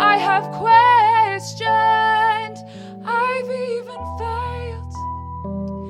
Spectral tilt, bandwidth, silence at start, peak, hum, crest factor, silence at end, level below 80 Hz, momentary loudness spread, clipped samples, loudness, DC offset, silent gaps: -4.5 dB/octave; 12 kHz; 0 s; -2 dBFS; none; 18 dB; 0 s; -42 dBFS; 17 LU; under 0.1%; -18 LUFS; under 0.1%; none